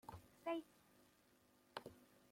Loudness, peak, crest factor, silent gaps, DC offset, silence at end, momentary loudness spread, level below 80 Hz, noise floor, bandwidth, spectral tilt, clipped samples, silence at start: -51 LUFS; -32 dBFS; 24 dB; none; under 0.1%; 0.25 s; 19 LU; -80 dBFS; -75 dBFS; 16.5 kHz; -5 dB/octave; under 0.1%; 0.05 s